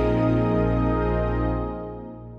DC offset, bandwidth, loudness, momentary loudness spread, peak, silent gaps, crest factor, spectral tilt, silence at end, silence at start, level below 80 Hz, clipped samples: under 0.1%; 5.2 kHz; -23 LUFS; 13 LU; -10 dBFS; none; 12 dB; -10 dB/octave; 0 s; 0 s; -30 dBFS; under 0.1%